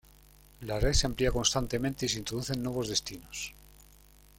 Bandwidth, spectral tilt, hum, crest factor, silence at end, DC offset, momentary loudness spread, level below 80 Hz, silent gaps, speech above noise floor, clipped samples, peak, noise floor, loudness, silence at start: 16.5 kHz; -3.5 dB/octave; none; 22 dB; 0.7 s; under 0.1%; 12 LU; -40 dBFS; none; 27 dB; under 0.1%; -10 dBFS; -57 dBFS; -31 LUFS; 0.6 s